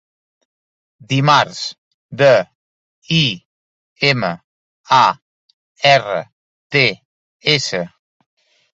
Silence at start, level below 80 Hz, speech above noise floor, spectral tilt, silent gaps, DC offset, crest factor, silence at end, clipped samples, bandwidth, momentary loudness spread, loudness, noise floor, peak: 1.1 s; -60 dBFS; over 75 dB; -4.5 dB/octave; 1.78-2.09 s, 2.55-3.02 s, 3.45-3.96 s, 4.44-4.84 s, 5.22-5.75 s, 6.32-6.70 s, 7.05-7.40 s; under 0.1%; 18 dB; 0.85 s; under 0.1%; 8.2 kHz; 18 LU; -15 LUFS; under -90 dBFS; 0 dBFS